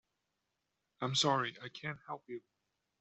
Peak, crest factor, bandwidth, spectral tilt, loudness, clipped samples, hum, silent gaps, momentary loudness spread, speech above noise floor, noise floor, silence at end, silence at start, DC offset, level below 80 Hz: -18 dBFS; 22 dB; 8.2 kHz; -3.5 dB/octave; -36 LUFS; under 0.1%; none; none; 17 LU; 49 dB; -86 dBFS; 0.6 s; 1 s; under 0.1%; -78 dBFS